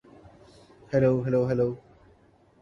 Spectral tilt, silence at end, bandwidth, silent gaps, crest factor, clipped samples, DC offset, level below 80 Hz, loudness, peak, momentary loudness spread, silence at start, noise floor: -9.5 dB/octave; 0.8 s; 7.2 kHz; none; 18 dB; under 0.1%; under 0.1%; -56 dBFS; -25 LUFS; -10 dBFS; 6 LU; 0.9 s; -60 dBFS